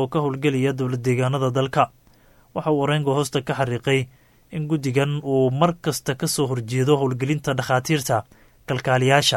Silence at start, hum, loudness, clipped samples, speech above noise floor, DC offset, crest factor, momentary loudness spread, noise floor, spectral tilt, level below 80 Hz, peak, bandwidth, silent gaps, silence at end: 0 s; none; -22 LUFS; under 0.1%; 33 dB; under 0.1%; 20 dB; 6 LU; -54 dBFS; -5.5 dB/octave; -54 dBFS; -2 dBFS; 17 kHz; none; 0 s